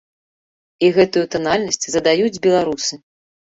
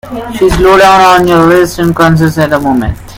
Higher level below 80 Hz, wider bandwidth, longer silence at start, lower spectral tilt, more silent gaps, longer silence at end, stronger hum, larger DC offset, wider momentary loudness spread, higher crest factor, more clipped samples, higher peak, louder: second, -54 dBFS vs -24 dBFS; second, 8.2 kHz vs 17 kHz; first, 0.8 s vs 0.05 s; second, -3.5 dB/octave vs -6 dB/octave; neither; first, 0.55 s vs 0 s; neither; neither; about the same, 6 LU vs 8 LU; first, 16 dB vs 6 dB; second, under 0.1% vs 3%; about the same, -2 dBFS vs 0 dBFS; second, -17 LUFS vs -6 LUFS